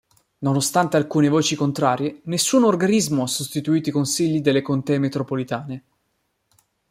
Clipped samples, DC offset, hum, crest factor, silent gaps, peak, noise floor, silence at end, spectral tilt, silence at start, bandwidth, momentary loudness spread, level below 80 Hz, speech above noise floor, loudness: under 0.1%; under 0.1%; none; 18 dB; none; -4 dBFS; -71 dBFS; 1.1 s; -5 dB/octave; 0.4 s; 16 kHz; 9 LU; -62 dBFS; 51 dB; -20 LUFS